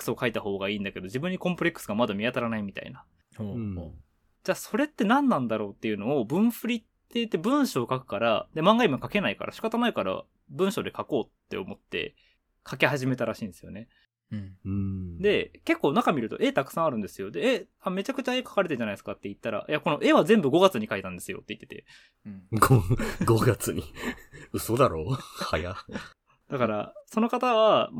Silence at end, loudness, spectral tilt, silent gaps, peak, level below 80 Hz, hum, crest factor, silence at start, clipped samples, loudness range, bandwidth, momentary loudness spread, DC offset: 0 s; -27 LUFS; -5.5 dB/octave; none; -4 dBFS; -52 dBFS; none; 24 dB; 0 s; under 0.1%; 6 LU; 18 kHz; 16 LU; under 0.1%